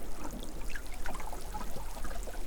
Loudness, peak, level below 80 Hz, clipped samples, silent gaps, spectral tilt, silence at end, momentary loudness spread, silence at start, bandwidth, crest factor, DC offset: -43 LUFS; -22 dBFS; -40 dBFS; under 0.1%; none; -4 dB/octave; 0 s; 1 LU; 0 s; over 20 kHz; 10 dB; under 0.1%